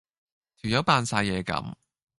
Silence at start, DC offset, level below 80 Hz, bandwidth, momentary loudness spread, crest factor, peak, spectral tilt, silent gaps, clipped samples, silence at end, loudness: 0.65 s; under 0.1%; -52 dBFS; 11.5 kHz; 13 LU; 22 dB; -6 dBFS; -4.5 dB/octave; none; under 0.1%; 0.45 s; -26 LUFS